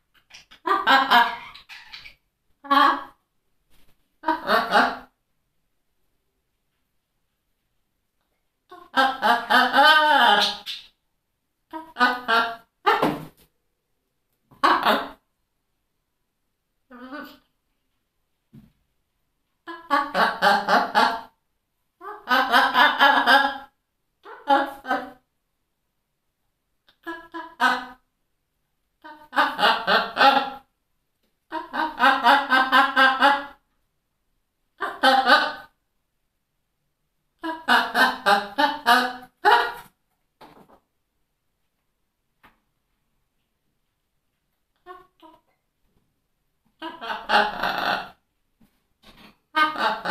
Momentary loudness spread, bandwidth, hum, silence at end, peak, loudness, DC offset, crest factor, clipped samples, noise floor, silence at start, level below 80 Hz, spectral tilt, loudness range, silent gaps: 22 LU; 14.5 kHz; none; 0 s; -2 dBFS; -20 LUFS; under 0.1%; 24 dB; under 0.1%; -76 dBFS; 0.65 s; -64 dBFS; -2.5 dB/octave; 10 LU; none